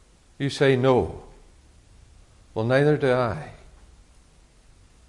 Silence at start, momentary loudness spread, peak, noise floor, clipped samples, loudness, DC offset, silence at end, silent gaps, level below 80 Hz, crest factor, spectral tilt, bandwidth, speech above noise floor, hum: 0.4 s; 16 LU; -8 dBFS; -55 dBFS; under 0.1%; -23 LUFS; under 0.1%; 1.5 s; none; -52 dBFS; 18 dB; -7 dB/octave; 11.5 kHz; 33 dB; none